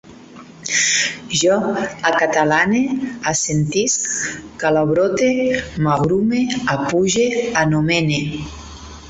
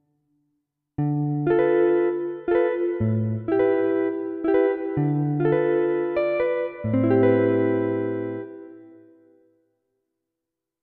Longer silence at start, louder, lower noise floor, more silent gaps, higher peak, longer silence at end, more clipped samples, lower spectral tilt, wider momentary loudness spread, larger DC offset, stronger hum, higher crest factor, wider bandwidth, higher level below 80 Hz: second, 0.05 s vs 1 s; first, -17 LUFS vs -23 LUFS; second, -40 dBFS vs -85 dBFS; neither; first, -2 dBFS vs -8 dBFS; second, 0 s vs 1.95 s; neither; second, -4 dB/octave vs -8.5 dB/octave; about the same, 7 LU vs 9 LU; neither; neither; about the same, 16 dB vs 16 dB; first, 8.2 kHz vs 4.4 kHz; first, -46 dBFS vs -58 dBFS